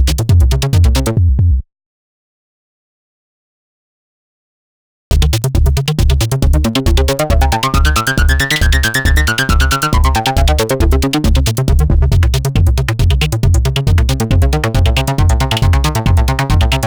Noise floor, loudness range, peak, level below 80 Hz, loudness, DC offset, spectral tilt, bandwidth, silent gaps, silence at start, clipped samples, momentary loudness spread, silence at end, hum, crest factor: under -90 dBFS; 7 LU; -2 dBFS; -14 dBFS; -13 LUFS; under 0.1%; -5 dB/octave; over 20 kHz; 1.86-5.11 s; 0 s; under 0.1%; 2 LU; 0 s; none; 8 dB